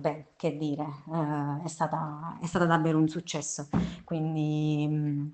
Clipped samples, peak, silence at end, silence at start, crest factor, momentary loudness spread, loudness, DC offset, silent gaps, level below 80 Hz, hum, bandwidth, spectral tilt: under 0.1%; -10 dBFS; 0 s; 0 s; 20 dB; 9 LU; -30 LUFS; under 0.1%; none; -56 dBFS; none; 9 kHz; -6 dB/octave